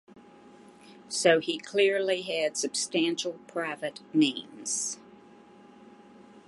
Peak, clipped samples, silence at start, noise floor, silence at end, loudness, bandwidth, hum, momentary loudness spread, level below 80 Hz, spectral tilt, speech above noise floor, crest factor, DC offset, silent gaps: -8 dBFS; under 0.1%; 0.15 s; -53 dBFS; 0.1 s; -28 LUFS; 11.5 kHz; none; 11 LU; -80 dBFS; -2.5 dB/octave; 25 dB; 22 dB; under 0.1%; none